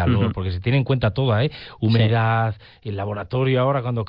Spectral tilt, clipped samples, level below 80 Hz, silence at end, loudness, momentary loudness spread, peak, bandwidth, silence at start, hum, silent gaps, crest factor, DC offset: -10.5 dB/octave; under 0.1%; -46 dBFS; 0 s; -21 LUFS; 9 LU; -6 dBFS; 5.4 kHz; 0 s; none; none; 14 dB; under 0.1%